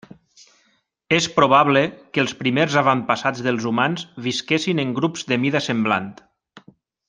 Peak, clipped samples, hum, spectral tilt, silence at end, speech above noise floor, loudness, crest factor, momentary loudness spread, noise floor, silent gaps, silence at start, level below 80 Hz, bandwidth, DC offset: -2 dBFS; under 0.1%; none; -5 dB/octave; 0.5 s; 45 dB; -20 LUFS; 20 dB; 8 LU; -65 dBFS; none; 1.1 s; -62 dBFS; 9.8 kHz; under 0.1%